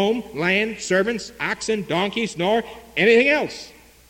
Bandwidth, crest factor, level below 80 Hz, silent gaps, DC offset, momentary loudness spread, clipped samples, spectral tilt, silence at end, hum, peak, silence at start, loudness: 16.5 kHz; 18 dB; -54 dBFS; none; under 0.1%; 10 LU; under 0.1%; -4 dB/octave; 0.4 s; none; -4 dBFS; 0 s; -21 LUFS